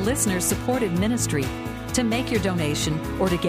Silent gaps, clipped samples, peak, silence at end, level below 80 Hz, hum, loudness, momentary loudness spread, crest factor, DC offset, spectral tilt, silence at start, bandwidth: none; under 0.1%; -10 dBFS; 0 s; -38 dBFS; none; -24 LUFS; 5 LU; 14 dB; under 0.1%; -4.5 dB/octave; 0 s; 15.5 kHz